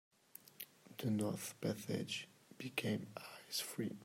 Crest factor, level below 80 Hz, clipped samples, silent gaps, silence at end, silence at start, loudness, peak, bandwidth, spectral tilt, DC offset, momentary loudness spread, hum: 22 dB; -82 dBFS; under 0.1%; none; 0 s; 0.45 s; -43 LUFS; -22 dBFS; 16 kHz; -4.5 dB/octave; under 0.1%; 15 LU; none